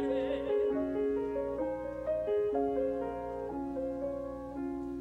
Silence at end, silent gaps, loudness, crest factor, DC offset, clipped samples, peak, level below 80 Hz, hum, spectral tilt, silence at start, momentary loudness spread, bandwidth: 0 s; none; -34 LUFS; 12 dB; under 0.1%; under 0.1%; -20 dBFS; -54 dBFS; 60 Hz at -55 dBFS; -8 dB/octave; 0 s; 7 LU; 8 kHz